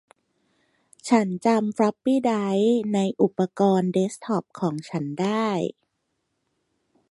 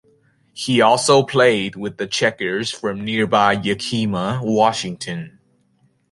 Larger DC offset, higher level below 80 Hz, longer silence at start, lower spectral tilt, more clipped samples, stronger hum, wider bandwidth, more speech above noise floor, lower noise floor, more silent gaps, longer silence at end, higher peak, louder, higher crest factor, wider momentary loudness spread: neither; second, -70 dBFS vs -56 dBFS; first, 1.05 s vs 0.55 s; first, -6.5 dB/octave vs -4.5 dB/octave; neither; neither; about the same, 11.5 kHz vs 11.5 kHz; first, 53 dB vs 43 dB; first, -76 dBFS vs -61 dBFS; neither; first, 1.4 s vs 0.85 s; second, -6 dBFS vs 0 dBFS; second, -23 LUFS vs -18 LUFS; about the same, 18 dB vs 18 dB; second, 8 LU vs 13 LU